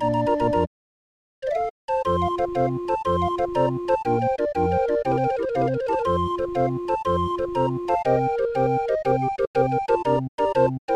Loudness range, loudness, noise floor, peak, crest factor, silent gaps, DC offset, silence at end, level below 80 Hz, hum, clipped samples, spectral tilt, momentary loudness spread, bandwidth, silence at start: 2 LU; -23 LUFS; under -90 dBFS; -8 dBFS; 16 dB; 0.67-1.42 s, 1.70-1.88 s, 9.47-9.54 s, 10.28-10.38 s, 10.79-10.88 s; under 0.1%; 0 s; -46 dBFS; none; under 0.1%; -8 dB/octave; 4 LU; 10.5 kHz; 0 s